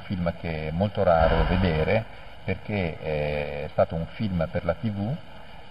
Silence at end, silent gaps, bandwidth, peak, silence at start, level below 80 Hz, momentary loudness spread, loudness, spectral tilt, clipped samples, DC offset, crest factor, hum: 0 s; none; 5.6 kHz; -8 dBFS; 0 s; -36 dBFS; 11 LU; -26 LUFS; -9 dB/octave; under 0.1%; 0.8%; 18 dB; none